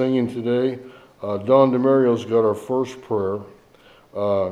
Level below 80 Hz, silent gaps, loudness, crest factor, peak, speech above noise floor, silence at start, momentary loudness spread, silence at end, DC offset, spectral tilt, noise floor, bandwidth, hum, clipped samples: -66 dBFS; none; -20 LUFS; 18 dB; -2 dBFS; 31 dB; 0 s; 14 LU; 0 s; under 0.1%; -8 dB/octave; -51 dBFS; 12 kHz; none; under 0.1%